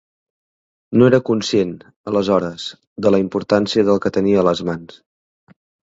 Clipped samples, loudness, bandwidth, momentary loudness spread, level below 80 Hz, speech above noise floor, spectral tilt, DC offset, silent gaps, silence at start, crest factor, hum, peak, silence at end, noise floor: under 0.1%; -17 LUFS; 8 kHz; 13 LU; -52 dBFS; over 73 dB; -6.5 dB/octave; under 0.1%; 1.96-2.04 s, 2.87-2.96 s; 0.9 s; 18 dB; none; 0 dBFS; 1.05 s; under -90 dBFS